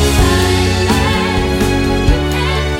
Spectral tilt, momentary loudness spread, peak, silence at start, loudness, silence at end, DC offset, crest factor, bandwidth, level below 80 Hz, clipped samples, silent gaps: -5 dB/octave; 3 LU; 0 dBFS; 0 s; -13 LUFS; 0 s; under 0.1%; 12 dB; 16.5 kHz; -18 dBFS; under 0.1%; none